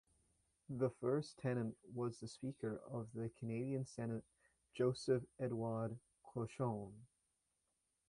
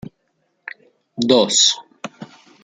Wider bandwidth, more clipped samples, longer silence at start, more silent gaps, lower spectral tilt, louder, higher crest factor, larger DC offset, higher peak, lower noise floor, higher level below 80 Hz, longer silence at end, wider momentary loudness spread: first, 11 kHz vs 9.8 kHz; neither; first, 0.7 s vs 0.05 s; neither; first, -7.5 dB/octave vs -2 dB/octave; second, -44 LUFS vs -15 LUFS; about the same, 18 dB vs 20 dB; neither; second, -26 dBFS vs 0 dBFS; first, -86 dBFS vs -68 dBFS; second, -76 dBFS vs -62 dBFS; first, 1.05 s vs 0.4 s; second, 10 LU vs 23 LU